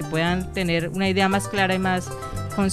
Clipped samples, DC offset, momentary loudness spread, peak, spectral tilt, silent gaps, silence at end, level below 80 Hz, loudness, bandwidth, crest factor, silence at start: under 0.1%; 0.5%; 8 LU; -8 dBFS; -5 dB/octave; none; 0 s; -42 dBFS; -23 LUFS; 14.5 kHz; 16 dB; 0 s